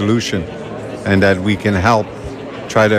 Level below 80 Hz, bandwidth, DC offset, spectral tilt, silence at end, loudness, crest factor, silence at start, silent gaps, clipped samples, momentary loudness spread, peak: -42 dBFS; 14 kHz; under 0.1%; -6 dB/octave; 0 s; -16 LUFS; 14 dB; 0 s; none; under 0.1%; 14 LU; -2 dBFS